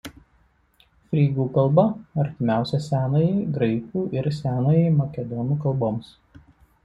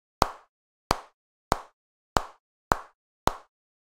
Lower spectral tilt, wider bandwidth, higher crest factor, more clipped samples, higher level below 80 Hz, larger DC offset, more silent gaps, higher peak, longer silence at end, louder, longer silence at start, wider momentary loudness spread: first, -9 dB/octave vs -4 dB/octave; second, 8 kHz vs 16 kHz; second, 18 dB vs 32 dB; neither; second, -54 dBFS vs -44 dBFS; neither; second, none vs 0.49-0.90 s, 1.14-1.51 s, 1.73-2.16 s, 2.40-2.71 s, 2.95-3.27 s; second, -4 dBFS vs 0 dBFS; first, 0.8 s vs 0.45 s; first, -23 LUFS vs -31 LUFS; second, 0.05 s vs 0.2 s; about the same, 8 LU vs 10 LU